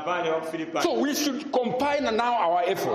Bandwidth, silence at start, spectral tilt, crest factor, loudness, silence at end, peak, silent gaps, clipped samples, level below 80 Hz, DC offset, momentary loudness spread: 15.5 kHz; 0 s; -3.5 dB/octave; 14 dB; -25 LUFS; 0 s; -12 dBFS; none; under 0.1%; -62 dBFS; under 0.1%; 4 LU